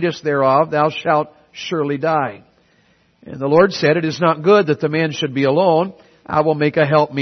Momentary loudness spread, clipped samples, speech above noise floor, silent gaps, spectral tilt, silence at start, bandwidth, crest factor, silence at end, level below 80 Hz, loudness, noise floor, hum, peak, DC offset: 11 LU; under 0.1%; 41 dB; none; -6.5 dB/octave; 0 s; 6.4 kHz; 16 dB; 0 s; -60 dBFS; -16 LUFS; -57 dBFS; none; 0 dBFS; under 0.1%